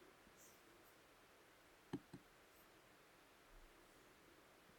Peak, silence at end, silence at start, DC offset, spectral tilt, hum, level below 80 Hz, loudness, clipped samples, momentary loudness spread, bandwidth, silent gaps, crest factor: -36 dBFS; 0 s; 0 s; under 0.1%; -4.5 dB/octave; none; -78 dBFS; -63 LUFS; under 0.1%; 12 LU; 19 kHz; none; 28 dB